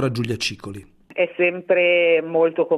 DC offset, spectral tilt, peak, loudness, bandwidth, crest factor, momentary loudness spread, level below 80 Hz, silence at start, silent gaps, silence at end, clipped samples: under 0.1%; -5 dB/octave; -6 dBFS; -19 LUFS; 12.5 kHz; 14 dB; 19 LU; -58 dBFS; 0 s; none; 0 s; under 0.1%